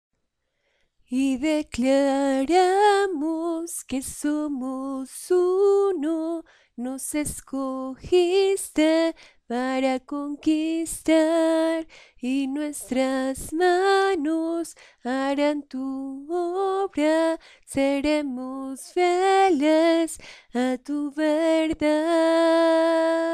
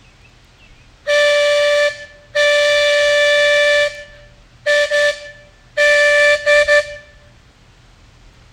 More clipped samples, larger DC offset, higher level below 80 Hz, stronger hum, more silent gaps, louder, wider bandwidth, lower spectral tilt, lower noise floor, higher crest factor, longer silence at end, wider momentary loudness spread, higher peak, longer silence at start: neither; neither; second, -54 dBFS vs -48 dBFS; neither; neither; second, -23 LUFS vs -13 LUFS; second, 14 kHz vs 15.5 kHz; first, -3.5 dB/octave vs 0.5 dB/octave; first, -75 dBFS vs -47 dBFS; about the same, 16 dB vs 16 dB; second, 0 s vs 1.55 s; about the same, 12 LU vs 14 LU; second, -8 dBFS vs 0 dBFS; about the same, 1.1 s vs 1.05 s